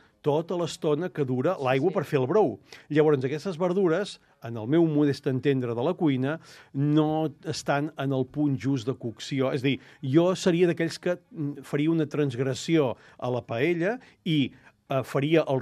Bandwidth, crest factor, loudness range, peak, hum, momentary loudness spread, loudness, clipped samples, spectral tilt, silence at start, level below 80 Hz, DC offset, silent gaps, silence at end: 13 kHz; 18 dB; 2 LU; -8 dBFS; none; 9 LU; -26 LUFS; under 0.1%; -7 dB/octave; 0.25 s; -70 dBFS; under 0.1%; none; 0 s